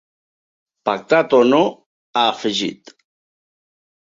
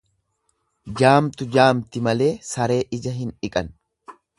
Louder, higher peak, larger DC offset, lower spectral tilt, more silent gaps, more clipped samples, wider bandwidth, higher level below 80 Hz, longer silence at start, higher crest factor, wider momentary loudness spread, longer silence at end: first, -17 LUFS vs -20 LUFS; about the same, -2 dBFS vs 0 dBFS; neither; about the same, -4.5 dB/octave vs -5.5 dB/octave; first, 1.86-2.13 s vs none; neither; second, 7.8 kHz vs 11.5 kHz; second, -66 dBFS vs -52 dBFS; about the same, 0.85 s vs 0.85 s; about the same, 18 dB vs 22 dB; about the same, 11 LU vs 12 LU; first, 1.3 s vs 0.25 s